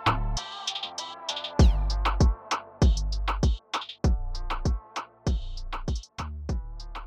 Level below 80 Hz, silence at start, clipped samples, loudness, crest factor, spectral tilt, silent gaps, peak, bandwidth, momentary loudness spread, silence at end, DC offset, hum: -28 dBFS; 0 s; under 0.1%; -29 LUFS; 16 dB; -5 dB/octave; none; -12 dBFS; 9.2 kHz; 12 LU; 0 s; under 0.1%; none